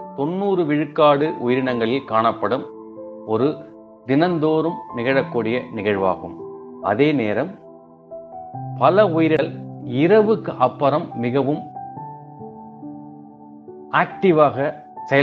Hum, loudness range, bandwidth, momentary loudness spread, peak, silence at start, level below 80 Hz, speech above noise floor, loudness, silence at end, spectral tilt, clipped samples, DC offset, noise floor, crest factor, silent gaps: none; 5 LU; 6.2 kHz; 21 LU; -2 dBFS; 0 s; -64 dBFS; 25 dB; -19 LUFS; 0 s; -5.5 dB/octave; under 0.1%; under 0.1%; -43 dBFS; 20 dB; none